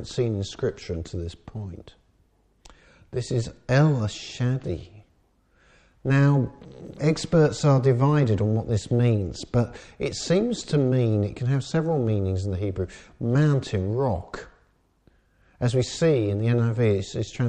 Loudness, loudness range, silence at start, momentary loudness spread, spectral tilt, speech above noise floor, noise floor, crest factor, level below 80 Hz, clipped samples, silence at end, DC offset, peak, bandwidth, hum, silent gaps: -24 LUFS; 5 LU; 0 s; 14 LU; -7 dB/octave; 40 dB; -64 dBFS; 16 dB; -48 dBFS; under 0.1%; 0 s; under 0.1%; -8 dBFS; 9.6 kHz; none; none